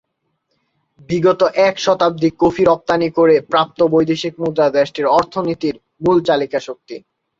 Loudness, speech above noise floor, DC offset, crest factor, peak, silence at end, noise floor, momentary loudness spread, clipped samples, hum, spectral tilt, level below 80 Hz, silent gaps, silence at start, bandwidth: -16 LUFS; 55 dB; under 0.1%; 14 dB; -2 dBFS; 0.4 s; -70 dBFS; 9 LU; under 0.1%; none; -6 dB/octave; -52 dBFS; none; 1.1 s; 7.6 kHz